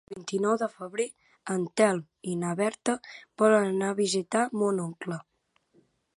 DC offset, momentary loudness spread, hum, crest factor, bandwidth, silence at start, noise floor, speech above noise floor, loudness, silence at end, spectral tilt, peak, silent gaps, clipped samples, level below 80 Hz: under 0.1%; 11 LU; none; 22 dB; 11.5 kHz; 0.1 s; -69 dBFS; 41 dB; -28 LUFS; 0.95 s; -5 dB/octave; -8 dBFS; none; under 0.1%; -76 dBFS